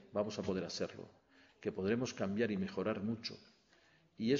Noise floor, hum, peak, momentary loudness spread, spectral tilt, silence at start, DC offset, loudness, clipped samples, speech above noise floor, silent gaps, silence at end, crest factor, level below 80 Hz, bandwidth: -69 dBFS; none; -20 dBFS; 10 LU; -5 dB/octave; 0 s; under 0.1%; -39 LUFS; under 0.1%; 31 dB; none; 0 s; 18 dB; -74 dBFS; 7.4 kHz